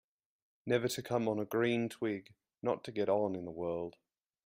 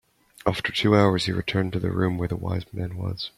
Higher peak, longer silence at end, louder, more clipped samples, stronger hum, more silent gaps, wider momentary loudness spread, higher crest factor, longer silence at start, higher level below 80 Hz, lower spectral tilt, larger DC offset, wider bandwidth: second, -18 dBFS vs -6 dBFS; first, 0.55 s vs 0.1 s; second, -36 LUFS vs -25 LUFS; neither; neither; neither; second, 8 LU vs 11 LU; about the same, 20 dB vs 20 dB; first, 0.65 s vs 0.45 s; second, -74 dBFS vs -50 dBFS; about the same, -5.5 dB/octave vs -6.5 dB/octave; neither; first, 16 kHz vs 13.5 kHz